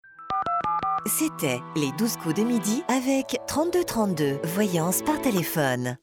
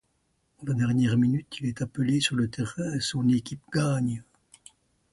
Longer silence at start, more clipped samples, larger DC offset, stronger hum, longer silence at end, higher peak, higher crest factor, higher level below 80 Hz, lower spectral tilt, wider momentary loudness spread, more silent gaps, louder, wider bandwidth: second, 0.05 s vs 0.6 s; neither; neither; neither; second, 0.05 s vs 0.9 s; about the same, -10 dBFS vs -10 dBFS; about the same, 14 dB vs 16 dB; about the same, -58 dBFS vs -58 dBFS; about the same, -4.5 dB/octave vs -5.5 dB/octave; second, 3 LU vs 8 LU; neither; about the same, -25 LUFS vs -27 LUFS; first, 19 kHz vs 11.5 kHz